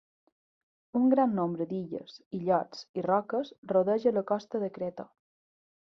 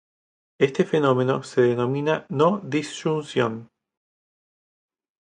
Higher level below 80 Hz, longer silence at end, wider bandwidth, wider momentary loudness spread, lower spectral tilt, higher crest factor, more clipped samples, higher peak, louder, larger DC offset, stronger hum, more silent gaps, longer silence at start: second, -74 dBFS vs -68 dBFS; second, 0.9 s vs 1.55 s; second, 6.4 kHz vs 10 kHz; first, 13 LU vs 6 LU; first, -8 dB/octave vs -6.5 dB/octave; about the same, 18 dB vs 20 dB; neither; second, -12 dBFS vs -4 dBFS; second, -30 LUFS vs -23 LUFS; neither; neither; first, 2.26-2.31 s, 2.89-2.94 s, 3.58-3.63 s vs none; first, 0.95 s vs 0.6 s